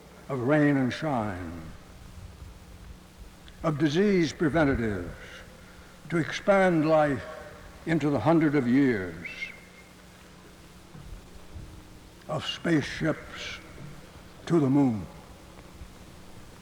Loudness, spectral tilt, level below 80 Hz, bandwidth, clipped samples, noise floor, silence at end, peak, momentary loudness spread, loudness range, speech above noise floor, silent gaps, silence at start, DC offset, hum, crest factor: -26 LUFS; -6.5 dB/octave; -50 dBFS; 17 kHz; under 0.1%; -50 dBFS; 0 s; -10 dBFS; 25 LU; 9 LU; 25 dB; none; 0.1 s; under 0.1%; none; 18 dB